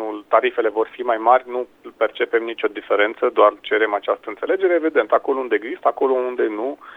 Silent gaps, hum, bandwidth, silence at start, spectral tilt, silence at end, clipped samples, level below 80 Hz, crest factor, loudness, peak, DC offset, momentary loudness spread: none; none; 4 kHz; 0 s; -5 dB/octave; 0 s; under 0.1%; -68 dBFS; 18 dB; -20 LUFS; 0 dBFS; under 0.1%; 8 LU